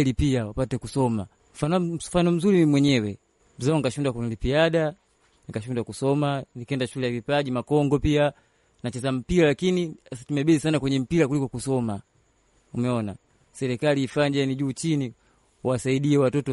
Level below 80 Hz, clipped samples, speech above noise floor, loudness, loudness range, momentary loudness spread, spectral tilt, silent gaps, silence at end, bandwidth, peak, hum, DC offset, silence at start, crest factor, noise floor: -46 dBFS; under 0.1%; 41 dB; -24 LUFS; 4 LU; 11 LU; -6.5 dB/octave; none; 0 s; 11.5 kHz; -8 dBFS; none; under 0.1%; 0 s; 16 dB; -64 dBFS